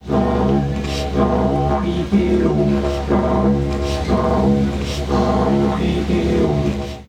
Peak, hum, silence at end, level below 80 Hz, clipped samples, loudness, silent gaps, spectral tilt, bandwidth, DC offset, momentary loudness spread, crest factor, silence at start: -4 dBFS; none; 0.05 s; -26 dBFS; under 0.1%; -18 LUFS; none; -7.5 dB/octave; 11.5 kHz; under 0.1%; 5 LU; 14 dB; 0.05 s